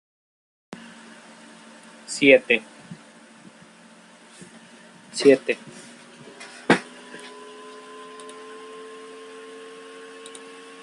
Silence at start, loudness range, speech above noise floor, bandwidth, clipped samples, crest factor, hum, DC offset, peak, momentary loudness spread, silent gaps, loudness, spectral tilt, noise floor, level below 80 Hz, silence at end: 2.1 s; 17 LU; 31 dB; 11.5 kHz; under 0.1%; 26 dB; none; under 0.1%; -2 dBFS; 27 LU; none; -20 LUFS; -4 dB/octave; -50 dBFS; -74 dBFS; 2 s